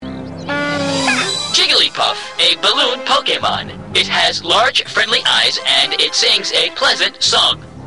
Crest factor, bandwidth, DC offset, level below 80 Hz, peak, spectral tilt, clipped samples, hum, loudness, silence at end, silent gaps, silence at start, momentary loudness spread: 14 dB; 12.5 kHz; 0.5%; -50 dBFS; -2 dBFS; -1.5 dB/octave; under 0.1%; none; -13 LUFS; 0 s; none; 0 s; 7 LU